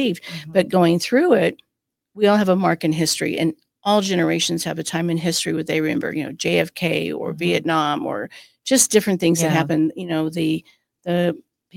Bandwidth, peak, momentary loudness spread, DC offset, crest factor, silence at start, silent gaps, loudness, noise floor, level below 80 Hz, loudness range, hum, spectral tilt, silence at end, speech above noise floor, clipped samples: 16.5 kHz; -2 dBFS; 9 LU; under 0.1%; 18 dB; 0 s; none; -20 LUFS; -57 dBFS; -62 dBFS; 3 LU; none; -4.5 dB/octave; 0.35 s; 37 dB; under 0.1%